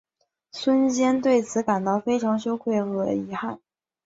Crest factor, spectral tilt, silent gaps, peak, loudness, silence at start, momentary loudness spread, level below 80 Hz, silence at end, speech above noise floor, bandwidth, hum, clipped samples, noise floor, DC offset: 16 dB; -5.5 dB/octave; none; -8 dBFS; -24 LUFS; 0.55 s; 11 LU; -64 dBFS; 0.5 s; 41 dB; 7.8 kHz; none; under 0.1%; -64 dBFS; under 0.1%